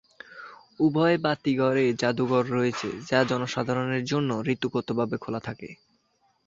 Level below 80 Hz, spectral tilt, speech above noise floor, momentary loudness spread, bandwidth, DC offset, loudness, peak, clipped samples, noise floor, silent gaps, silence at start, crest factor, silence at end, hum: -64 dBFS; -6 dB/octave; 44 dB; 19 LU; 7.8 kHz; under 0.1%; -26 LUFS; -6 dBFS; under 0.1%; -69 dBFS; none; 0.3 s; 20 dB; 0.75 s; none